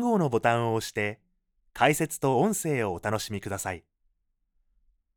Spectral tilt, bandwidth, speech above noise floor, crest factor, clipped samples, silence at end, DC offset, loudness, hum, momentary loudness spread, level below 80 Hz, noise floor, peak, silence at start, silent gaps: -5 dB/octave; over 20 kHz; 47 dB; 22 dB; under 0.1%; 1.35 s; under 0.1%; -27 LUFS; none; 9 LU; -60 dBFS; -74 dBFS; -6 dBFS; 0 s; none